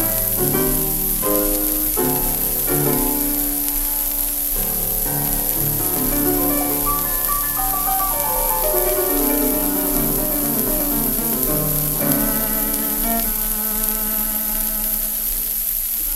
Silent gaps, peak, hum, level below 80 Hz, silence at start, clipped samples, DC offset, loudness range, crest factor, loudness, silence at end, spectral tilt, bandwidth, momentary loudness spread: none; 0 dBFS; none; -32 dBFS; 0 s; under 0.1%; 0.1%; 1 LU; 20 dB; -17 LUFS; 0 s; -3.5 dB/octave; 16.5 kHz; 2 LU